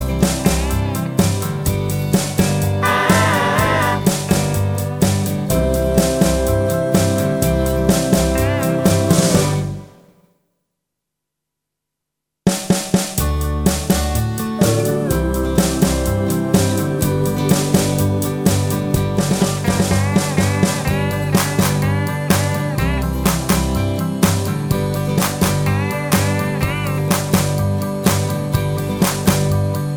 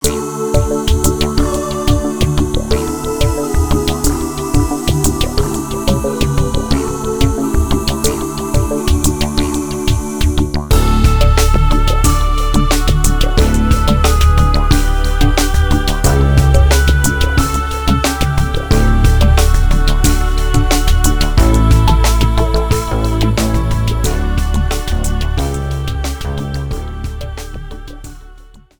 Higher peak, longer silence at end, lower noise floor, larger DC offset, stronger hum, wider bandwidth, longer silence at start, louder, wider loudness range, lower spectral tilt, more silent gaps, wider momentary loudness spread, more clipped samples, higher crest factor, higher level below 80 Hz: about the same, 0 dBFS vs 0 dBFS; about the same, 0 s vs 0 s; first, -80 dBFS vs -38 dBFS; second, under 0.1% vs 2%; neither; about the same, over 20 kHz vs over 20 kHz; about the same, 0 s vs 0 s; about the same, -17 LUFS vs -15 LUFS; about the same, 4 LU vs 4 LU; about the same, -5.5 dB/octave vs -5 dB/octave; neither; second, 4 LU vs 7 LU; neither; about the same, 16 dB vs 12 dB; second, -30 dBFS vs -14 dBFS